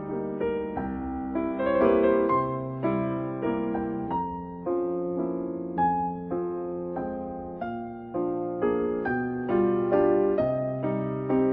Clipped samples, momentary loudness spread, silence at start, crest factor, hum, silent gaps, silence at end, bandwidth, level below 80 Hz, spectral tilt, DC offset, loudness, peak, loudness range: under 0.1%; 10 LU; 0 s; 18 dB; none; none; 0 s; 4.2 kHz; -52 dBFS; -11.5 dB/octave; under 0.1%; -28 LUFS; -10 dBFS; 4 LU